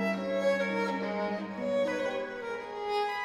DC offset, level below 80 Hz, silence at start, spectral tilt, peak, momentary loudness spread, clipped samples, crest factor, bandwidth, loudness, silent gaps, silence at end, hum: under 0.1%; -70 dBFS; 0 s; -5.5 dB/octave; -18 dBFS; 8 LU; under 0.1%; 14 dB; 12.5 kHz; -32 LUFS; none; 0 s; none